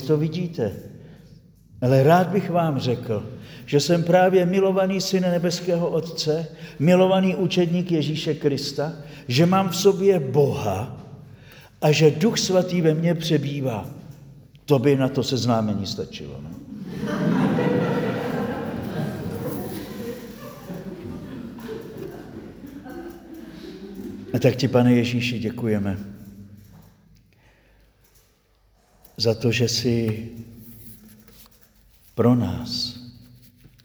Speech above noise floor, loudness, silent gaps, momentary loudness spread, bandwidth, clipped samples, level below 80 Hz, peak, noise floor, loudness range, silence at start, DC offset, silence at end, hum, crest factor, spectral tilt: 40 dB; -22 LUFS; none; 21 LU; over 20 kHz; under 0.1%; -54 dBFS; -4 dBFS; -61 dBFS; 12 LU; 0 s; under 0.1%; 0.75 s; none; 20 dB; -6 dB/octave